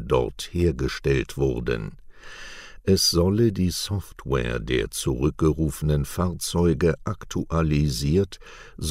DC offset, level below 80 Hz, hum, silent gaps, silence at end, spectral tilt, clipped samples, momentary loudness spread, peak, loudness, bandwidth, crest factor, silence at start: under 0.1%; -36 dBFS; none; none; 0 s; -5.5 dB/octave; under 0.1%; 12 LU; -8 dBFS; -24 LUFS; 16 kHz; 16 dB; 0 s